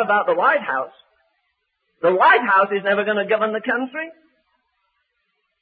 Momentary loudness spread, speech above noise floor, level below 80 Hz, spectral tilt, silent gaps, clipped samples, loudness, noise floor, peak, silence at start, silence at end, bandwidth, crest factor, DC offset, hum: 14 LU; 53 dB; -76 dBFS; -9 dB/octave; none; under 0.1%; -18 LUFS; -72 dBFS; -4 dBFS; 0 s; 1.5 s; 4.9 kHz; 16 dB; under 0.1%; none